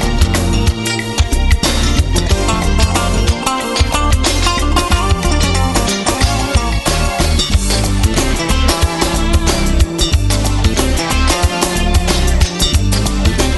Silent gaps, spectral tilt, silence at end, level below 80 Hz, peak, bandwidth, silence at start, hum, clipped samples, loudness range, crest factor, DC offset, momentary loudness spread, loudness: none; -4 dB/octave; 0 s; -16 dBFS; 0 dBFS; 12.5 kHz; 0 s; none; under 0.1%; 0 LU; 12 dB; under 0.1%; 2 LU; -14 LUFS